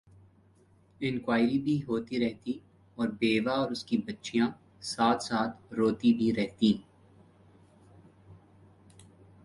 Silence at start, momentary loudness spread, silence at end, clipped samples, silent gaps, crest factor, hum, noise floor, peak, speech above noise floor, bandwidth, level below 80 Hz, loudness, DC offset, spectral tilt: 1 s; 9 LU; 1.1 s; under 0.1%; none; 20 dB; none; -62 dBFS; -12 dBFS; 34 dB; 11.5 kHz; -64 dBFS; -30 LUFS; under 0.1%; -5.5 dB/octave